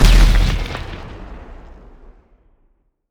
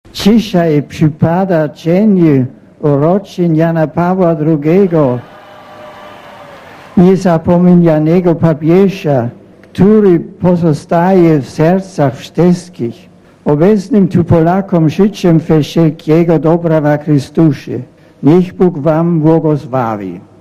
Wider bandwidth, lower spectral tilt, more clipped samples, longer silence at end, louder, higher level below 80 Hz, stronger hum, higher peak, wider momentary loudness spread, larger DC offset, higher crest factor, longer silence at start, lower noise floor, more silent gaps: about the same, 14 kHz vs 14 kHz; second, -5 dB/octave vs -8.5 dB/octave; second, under 0.1% vs 0.2%; first, 1.55 s vs 0.2 s; second, -18 LUFS vs -10 LUFS; first, -18 dBFS vs -40 dBFS; neither; about the same, 0 dBFS vs 0 dBFS; first, 26 LU vs 8 LU; neither; first, 16 dB vs 10 dB; second, 0 s vs 0.15 s; first, -60 dBFS vs -33 dBFS; neither